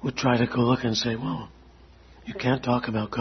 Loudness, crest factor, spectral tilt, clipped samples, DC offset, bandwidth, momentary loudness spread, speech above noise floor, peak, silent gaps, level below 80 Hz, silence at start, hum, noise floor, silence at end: -25 LUFS; 20 dB; -6 dB/octave; under 0.1%; under 0.1%; 6.4 kHz; 15 LU; 26 dB; -6 dBFS; none; -52 dBFS; 0 s; none; -51 dBFS; 0 s